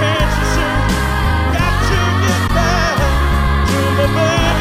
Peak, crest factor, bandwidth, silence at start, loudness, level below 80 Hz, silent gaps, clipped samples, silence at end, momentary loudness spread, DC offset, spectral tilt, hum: -2 dBFS; 12 dB; 16 kHz; 0 s; -15 LUFS; -20 dBFS; none; under 0.1%; 0 s; 2 LU; under 0.1%; -5 dB/octave; none